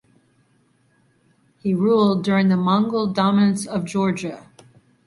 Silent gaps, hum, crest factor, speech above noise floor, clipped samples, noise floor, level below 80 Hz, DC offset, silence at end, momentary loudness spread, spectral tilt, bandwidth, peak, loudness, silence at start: none; none; 16 dB; 42 dB; under 0.1%; -61 dBFS; -60 dBFS; under 0.1%; 0.7 s; 11 LU; -6.5 dB/octave; 11.5 kHz; -6 dBFS; -20 LUFS; 1.65 s